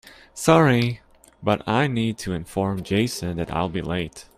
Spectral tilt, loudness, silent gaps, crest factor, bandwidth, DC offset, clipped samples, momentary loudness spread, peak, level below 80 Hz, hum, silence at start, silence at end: -6 dB/octave; -23 LUFS; none; 22 dB; 15.5 kHz; under 0.1%; under 0.1%; 12 LU; -2 dBFS; -48 dBFS; none; 0.05 s; 0.15 s